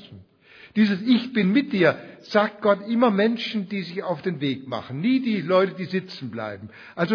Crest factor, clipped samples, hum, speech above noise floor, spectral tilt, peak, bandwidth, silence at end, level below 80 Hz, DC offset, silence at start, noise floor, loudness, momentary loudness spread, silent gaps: 18 dB; under 0.1%; none; 28 dB; -7.5 dB/octave; -4 dBFS; 5.4 kHz; 0 s; -70 dBFS; under 0.1%; 0 s; -51 dBFS; -23 LUFS; 12 LU; none